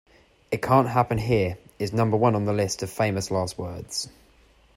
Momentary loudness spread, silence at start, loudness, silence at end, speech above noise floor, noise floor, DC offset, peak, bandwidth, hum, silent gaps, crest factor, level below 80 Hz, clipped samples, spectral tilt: 11 LU; 0.5 s; -25 LUFS; 0.65 s; 34 dB; -57 dBFS; under 0.1%; -6 dBFS; 16 kHz; none; none; 18 dB; -52 dBFS; under 0.1%; -5.5 dB/octave